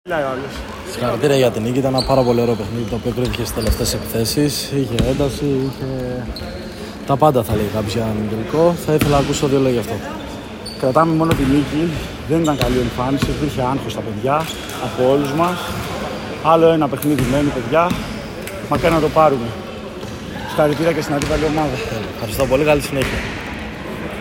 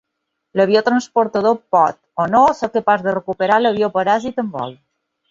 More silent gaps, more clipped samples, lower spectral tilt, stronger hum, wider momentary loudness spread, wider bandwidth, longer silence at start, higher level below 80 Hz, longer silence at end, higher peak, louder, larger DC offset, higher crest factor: neither; neither; about the same, -5.5 dB/octave vs -5.5 dB/octave; neither; first, 13 LU vs 10 LU; first, 16.5 kHz vs 7.6 kHz; second, 0.05 s vs 0.55 s; first, -34 dBFS vs -58 dBFS; second, 0 s vs 0.55 s; about the same, 0 dBFS vs -2 dBFS; about the same, -18 LUFS vs -17 LUFS; neither; about the same, 18 dB vs 16 dB